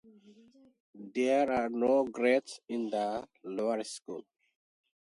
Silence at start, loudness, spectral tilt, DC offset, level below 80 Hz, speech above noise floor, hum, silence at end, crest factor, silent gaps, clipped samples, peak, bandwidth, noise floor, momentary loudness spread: 0.3 s; -31 LUFS; -4.5 dB/octave; under 0.1%; -72 dBFS; 29 dB; none; 0.9 s; 18 dB; 0.80-0.93 s; under 0.1%; -14 dBFS; 11.5 kHz; -60 dBFS; 14 LU